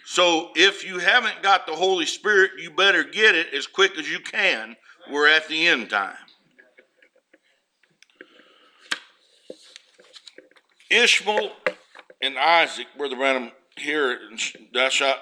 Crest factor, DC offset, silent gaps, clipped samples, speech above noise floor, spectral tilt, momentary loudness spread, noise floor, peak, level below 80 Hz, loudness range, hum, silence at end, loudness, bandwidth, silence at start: 20 dB; under 0.1%; none; under 0.1%; 45 dB; -1 dB/octave; 13 LU; -66 dBFS; -2 dBFS; -86 dBFS; 20 LU; none; 0 s; -20 LUFS; 13 kHz; 0.05 s